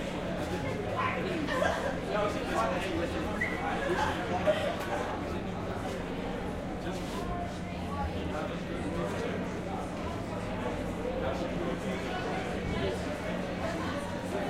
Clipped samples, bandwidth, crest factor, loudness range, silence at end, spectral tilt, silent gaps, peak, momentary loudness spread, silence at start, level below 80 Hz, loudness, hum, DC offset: under 0.1%; 16 kHz; 18 dB; 4 LU; 0 s; -6 dB/octave; none; -14 dBFS; 6 LU; 0 s; -46 dBFS; -33 LUFS; none; under 0.1%